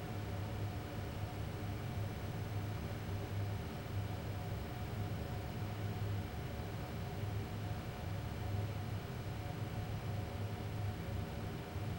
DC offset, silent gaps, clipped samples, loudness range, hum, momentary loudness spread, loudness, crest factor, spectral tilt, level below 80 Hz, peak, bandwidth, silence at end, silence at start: under 0.1%; none; under 0.1%; 0 LU; none; 2 LU; -43 LUFS; 14 dB; -6.5 dB/octave; -52 dBFS; -28 dBFS; 16 kHz; 0 s; 0 s